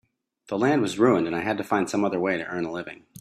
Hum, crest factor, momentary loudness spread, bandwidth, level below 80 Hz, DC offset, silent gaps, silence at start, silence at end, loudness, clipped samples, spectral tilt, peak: none; 18 dB; 11 LU; 14 kHz; -66 dBFS; under 0.1%; none; 0.5 s; 0 s; -24 LUFS; under 0.1%; -6 dB/octave; -8 dBFS